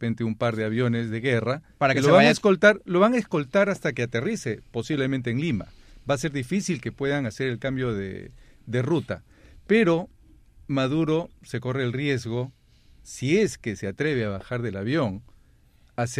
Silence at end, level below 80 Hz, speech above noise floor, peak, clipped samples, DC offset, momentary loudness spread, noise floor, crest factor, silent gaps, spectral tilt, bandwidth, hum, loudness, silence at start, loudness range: 0 s; -54 dBFS; 33 dB; -4 dBFS; under 0.1%; under 0.1%; 13 LU; -57 dBFS; 22 dB; none; -6 dB/octave; 14 kHz; none; -24 LUFS; 0 s; 7 LU